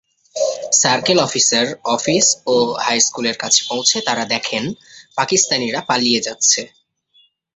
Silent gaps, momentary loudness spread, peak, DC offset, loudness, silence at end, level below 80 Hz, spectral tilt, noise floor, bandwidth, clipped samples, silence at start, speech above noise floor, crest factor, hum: none; 9 LU; 0 dBFS; under 0.1%; -15 LUFS; 0.9 s; -60 dBFS; -1.5 dB/octave; -57 dBFS; 8.4 kHz; under 0.1%; 0.35 s; 39 dB; 18 dB; none